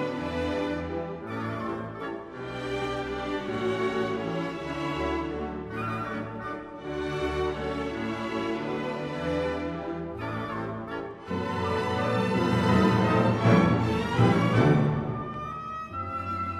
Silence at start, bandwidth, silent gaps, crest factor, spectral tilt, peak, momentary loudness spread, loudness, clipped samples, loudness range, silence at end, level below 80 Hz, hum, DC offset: 0 s; 12 kHz; none; 20 dB; -7.5 dB/octave; -8 dBFS; 13 LU; -28 LUFS; under 0.1%; 9 LU; 0 s; -48 dBFS; none; under 0.1%